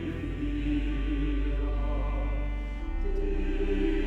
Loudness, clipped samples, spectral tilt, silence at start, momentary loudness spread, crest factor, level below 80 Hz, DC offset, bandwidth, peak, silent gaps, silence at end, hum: -32 LUFS; under 0.1%; -8.5 dB/octave; 0 s; 5 LU; 12 dB; -30 dBFS; under 0.1%; 4.5 kHz; -18 dBFS; none; 0 s; none